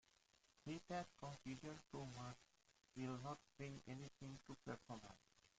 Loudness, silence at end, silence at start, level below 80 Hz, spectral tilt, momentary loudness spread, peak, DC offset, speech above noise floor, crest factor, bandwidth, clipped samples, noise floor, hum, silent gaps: -55 LUFS; 0.1 s; 0.55 s; -78 dBFS; -5.5 dB/octave; 9 LU; -36 dBFS; under 0.1%; 25 dB; 18 dB; 9 kHz; under 0.1%; -79 dBFS; none; none